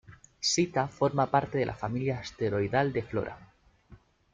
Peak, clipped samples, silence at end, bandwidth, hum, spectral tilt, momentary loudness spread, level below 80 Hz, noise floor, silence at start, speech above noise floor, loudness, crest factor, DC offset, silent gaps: -10 dBFS; under 0.1%; 0.4 s; 9.6 kHz; none; -4.5 dB/octave; 8 LU; -58 dBFS; -57 dBFS; 0.1 s; 28 dB; -29 LUFS; 20 dB; under 0.1%; none